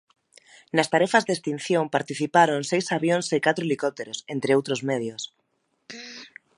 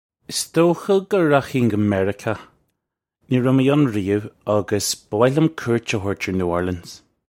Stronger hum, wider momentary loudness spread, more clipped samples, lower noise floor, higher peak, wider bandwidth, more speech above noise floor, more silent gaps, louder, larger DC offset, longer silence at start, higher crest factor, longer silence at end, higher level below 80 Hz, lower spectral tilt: neither; first, 18 LU vs 10 LU; neither; second, -54 dBFS vs -80 dBFS; second, -4 dBFS vs 0 dBFS; second, 11.5 kHz vs 16.5 kHz; second, 31 dB vs 61 dB; neither; second, -24 LUFS vs -20 LUFS; neither; first, 0.75 s vs 0.3 s; about the same, 22 dB vs 20 dB; about the same, 0.3 s vs 0.35 s; second, -74 dBFS vs -54 dBFS; about the same, -4.5 dB/octave vs -5.5 dB/octave